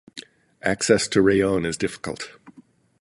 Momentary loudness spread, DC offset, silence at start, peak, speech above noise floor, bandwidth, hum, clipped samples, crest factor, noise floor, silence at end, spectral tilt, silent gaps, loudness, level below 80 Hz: 19 LU; under 0.1%; 0.15 s; -4 dBFS; 32 dB; 11.5 kHz; none; under 0.1%; 20 dB; -53 dBFS; 0.5 s; -4.5 dB/octave; none; -22 LUFS; -50 dBFS